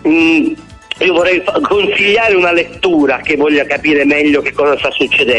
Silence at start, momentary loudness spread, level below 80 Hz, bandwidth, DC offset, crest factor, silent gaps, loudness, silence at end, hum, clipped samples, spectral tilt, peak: 0.05 s; 4 LU; -44 dBFS; 10.5 kHz; under 0.1%; 10 dB; none; -11 LUFS; 0 s; none; under 0.1%; -4.5 dB/octave; -2 dBFS